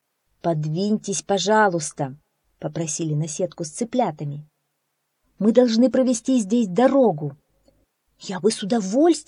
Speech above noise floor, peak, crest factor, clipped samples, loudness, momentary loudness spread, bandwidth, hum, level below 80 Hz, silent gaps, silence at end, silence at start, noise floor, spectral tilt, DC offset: 54 dB; -4 dBFS; 18 dB; under 0.1%; -21 LUFS; 14 LU; 11 kHz; none; -66 dBFS; none; 0.05 s; 0.45 s; -75 dBFS; -5 dB/octave; under 0.1%